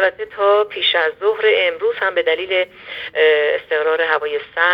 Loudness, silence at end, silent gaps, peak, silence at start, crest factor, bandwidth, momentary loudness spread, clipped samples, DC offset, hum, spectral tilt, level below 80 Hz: -17 LUFS; 0 s; none; 0 dBFS; 0 s; 16 dB; 5.4 kHz; 5 LU; under 0.1%; under 0.1%; none; -4 dB/octave; -62 dBFS